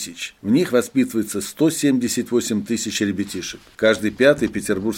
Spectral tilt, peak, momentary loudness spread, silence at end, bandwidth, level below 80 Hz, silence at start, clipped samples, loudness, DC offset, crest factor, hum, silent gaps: -4.5 dB/octave; -2 dBFS; 10 LU; 0 s; 17 kHz; -54 dBFS; 0 s; under 0.1%; -20 LUFS; under 0.1%; 18 dB; none; none